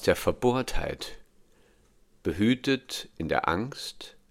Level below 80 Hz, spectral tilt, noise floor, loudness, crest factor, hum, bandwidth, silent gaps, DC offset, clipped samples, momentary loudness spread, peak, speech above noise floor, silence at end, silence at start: -44 dBFS; -5 dB/octave; -61 dBFS; -29 LUFS; 22 dB; none; 17 kHz; none; under 0.1%; under 0.1%; 13 LU; -8 dBFS; 34 dB; 0.2 s; 0 s